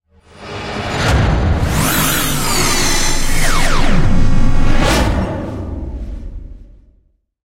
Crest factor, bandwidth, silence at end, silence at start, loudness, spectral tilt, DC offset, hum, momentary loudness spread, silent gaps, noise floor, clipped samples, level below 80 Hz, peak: 12 dB; 16 kHz; 0.95 s; 0.4 s; -16 LUFS; -4 dB/octave; under 0.1%; none; 15 LU; none; -56 dBFS; under 0.1%; -16 dBFS; 0 dBFS